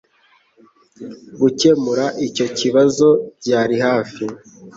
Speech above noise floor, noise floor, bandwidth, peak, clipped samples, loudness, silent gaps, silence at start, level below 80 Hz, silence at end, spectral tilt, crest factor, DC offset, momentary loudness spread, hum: 40 dB; -57 dBFS; 8 kHz; -2 dBFS; under 0.1%; -17 LUFS; none; 1 s; -60 dBFS; 0.05 s; -5 dB/octave; 16 dB; under 0.1%; 22 LU; none